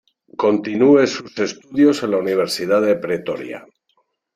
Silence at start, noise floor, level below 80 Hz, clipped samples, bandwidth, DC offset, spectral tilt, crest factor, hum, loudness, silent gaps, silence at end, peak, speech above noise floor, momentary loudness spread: 0.4 s; -66 dBFS; -64 dBFS; under 0.1%; 15 kHz; under 0.1%; -5 dB/octave; 16 dB; none; -18 LUFS; none; 0.75 s; -2 dBFS; 49 dB; 14 LU